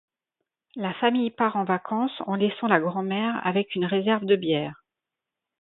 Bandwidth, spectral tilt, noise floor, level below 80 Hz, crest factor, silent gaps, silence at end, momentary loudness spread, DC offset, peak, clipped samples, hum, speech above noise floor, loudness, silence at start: 4.1 kHz; -10.5 dB/octave; -87 dBFS; -70 dBFS; 22 dB; none; 0.85 s; 5 LU; under 0.1%; -4 dBFS; under 0.1%; none; 63 dB; -25 LUFS; 0.75 s